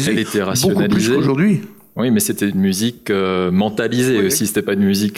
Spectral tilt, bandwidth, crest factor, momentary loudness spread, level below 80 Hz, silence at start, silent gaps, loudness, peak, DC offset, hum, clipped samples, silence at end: -5 dB/octave; 16.5 kHz; 10 dB; 4 LU; -52 dBFS; 0 s; none; -17 LUFS; -6 dBFS; under 0.1%; none; under 0.1%; 0 s